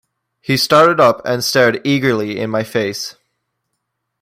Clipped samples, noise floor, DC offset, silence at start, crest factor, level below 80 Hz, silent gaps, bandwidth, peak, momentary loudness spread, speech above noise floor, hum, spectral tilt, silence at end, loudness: under 0.1%; -74 dBFS; under 0.1%; 0.5 s; 16 dB; -58 dBFS; none; 16 kHz; 0 dBFS; 12 LU; 59 dB; none; -4.5 dB/octave; 1.1 s; -14 LUFS